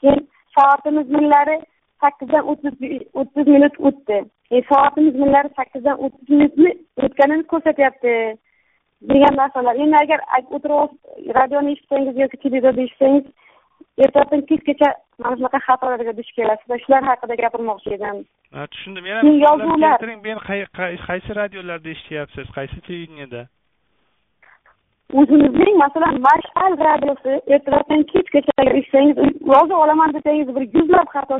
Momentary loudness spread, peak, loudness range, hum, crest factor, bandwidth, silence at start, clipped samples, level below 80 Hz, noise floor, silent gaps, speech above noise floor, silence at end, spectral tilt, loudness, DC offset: 15 LU; -2 dBFS; 6 LU; none; 14 dB; 3.9 kHz; 0.05 s; under 0.1%; -50 dBFS; -67 dBFS; none; 51 dB; 0 s; -4 dB/octave; -16 LUFS; under 0.1%